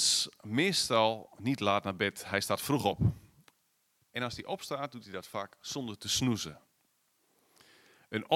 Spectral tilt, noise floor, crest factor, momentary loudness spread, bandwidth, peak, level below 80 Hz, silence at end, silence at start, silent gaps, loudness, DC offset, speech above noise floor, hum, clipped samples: -3.5 dB/octave; -75 dBFS; 22 dB; 13 LU; 16.5 kHz; -12 dBFS; -60 dBFS; 0 s; 0 s; none; -32 LUFS; under 0.1%; 42 dB; none; under 0.1%